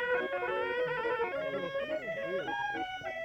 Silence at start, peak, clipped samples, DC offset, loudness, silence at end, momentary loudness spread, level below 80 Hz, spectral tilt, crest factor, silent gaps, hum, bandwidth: 0 s; -20 dBFS; under 0.1%; under 0.1%; -34 LUFS; 0 s; 4 LU; -66 dBFS; -5 dB/octave; 14 dB; none; none; 17.5 kHz